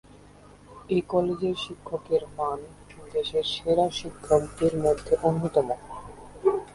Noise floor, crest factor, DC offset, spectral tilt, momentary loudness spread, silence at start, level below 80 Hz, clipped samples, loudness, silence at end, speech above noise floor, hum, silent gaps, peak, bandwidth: -51 dBFS; 20 dB; under 0.1%; -6 dB/octave; 12 LU; 0.7 s; -52 dBFS; under 0.1%; -27 LUFS; 0 s; 25 dB; 50 Hz at -50 dBFS; none; -8 dBFS; 11.5 kHz